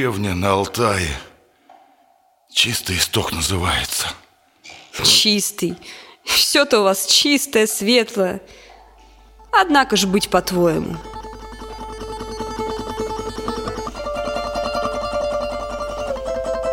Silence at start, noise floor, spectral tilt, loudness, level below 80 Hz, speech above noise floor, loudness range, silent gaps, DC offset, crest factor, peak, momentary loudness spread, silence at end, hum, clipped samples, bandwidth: 0 s; -57 dBFS; -3 dB/octave; -18 LUFS; -40 dBFS; 39 dB; 10 LU; none; under 0.1%; 18 dB; -2 dBFS; 18 LU; 0 s; none; under 0.1%; 17 kHz